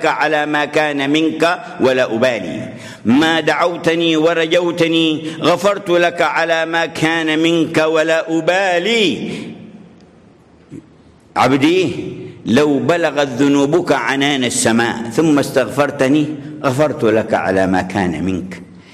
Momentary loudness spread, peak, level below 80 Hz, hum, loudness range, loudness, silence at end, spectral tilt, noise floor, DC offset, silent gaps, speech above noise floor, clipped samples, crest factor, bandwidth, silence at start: 9 LU; -2 dBFS; -50 dBFS; none; 4 LU; -15 LUFS; 0.15 s; -4.5 dB/octave; -46 dBFS; under 0.1%; none; 31 dB; under 0.1%; 12 dB; 15 kHz; 0 s